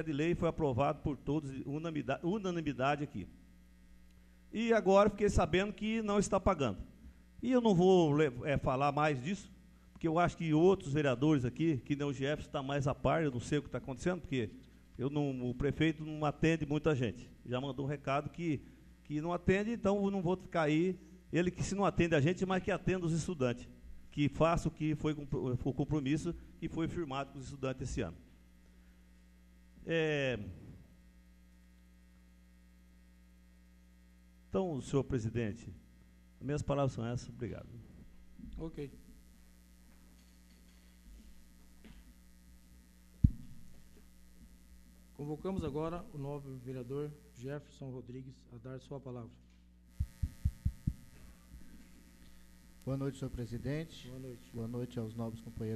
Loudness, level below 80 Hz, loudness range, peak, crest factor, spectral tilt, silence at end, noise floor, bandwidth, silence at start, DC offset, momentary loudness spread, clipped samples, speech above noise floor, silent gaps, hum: -35 LUFS; -52 dBFS; 12 LU; -10 dBFS; 26 dB; -6.5 dB/octave; 0 s; -61 dBFS; 13.5 kHz; 0 s; under 0.1%; 16 LU; under 0.1%; 27 dB; none; none